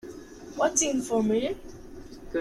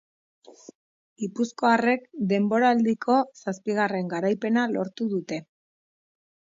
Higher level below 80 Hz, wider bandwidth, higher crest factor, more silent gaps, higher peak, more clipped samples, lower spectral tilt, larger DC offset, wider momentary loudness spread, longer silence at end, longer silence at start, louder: first, -52 dBFS vs -74 dBFS; first, 14 kHz vs 7.6 kHz; about the same, 18 dB vs 18 dB; second, none vs 0.75-1.16 s; second, -12 dBFS vs -8 dBFS; neither; second, -3 dB/octave vs -6 dB/octave; neither; first, 22 LU vs 11 LU; second, 0 s vs 1.15 s; second, 0.05 s vs 0.5 s; about the same, -26 LUFS vs -25 LUFS